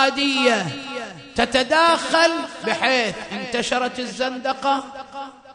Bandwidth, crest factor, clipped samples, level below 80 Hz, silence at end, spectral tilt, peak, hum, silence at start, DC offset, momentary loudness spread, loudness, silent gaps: 10.5 kHz; 18 dB; under 0.1%; -54 dBFS; 0 s; -3 dB/octave; -2 dBFS; none; 0 s; under 0.1%; 14 LU; -20 LUFS; none